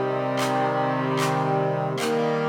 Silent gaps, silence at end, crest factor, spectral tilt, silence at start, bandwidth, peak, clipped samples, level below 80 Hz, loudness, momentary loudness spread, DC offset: none; 0 s; 12 dB; -5.5 dB/octave; 0 s; 20 kHz; -12 dBFS; under 0.1%; -70 dBFS; -24 LUFS; 2 LU; under 0.1%